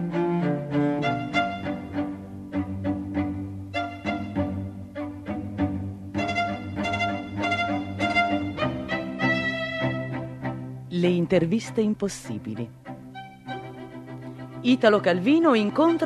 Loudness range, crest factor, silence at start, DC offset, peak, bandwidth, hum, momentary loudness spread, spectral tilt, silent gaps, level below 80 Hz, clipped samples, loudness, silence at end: 5 LU; 20 dB; 0 s; under 0.1%; -4 dBFS; 12.5 kHz; none; 16 LU; -6.5 dB/octave; none; -54 dBFS; under 0.1%; -26 LUFS; 0 s